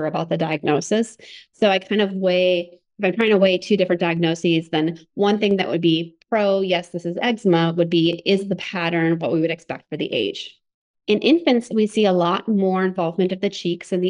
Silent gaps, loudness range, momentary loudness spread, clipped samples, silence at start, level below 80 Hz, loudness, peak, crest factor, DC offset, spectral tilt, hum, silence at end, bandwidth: 10.74-10.94 s; 2 LU; 7 LU; under 0.1%; 0 s; -68 dBFS; -20 LUFS; -4 dBFS; 16 dB; under 0.1%; -6 dB/octave; none; 0 s; 10.5 kHz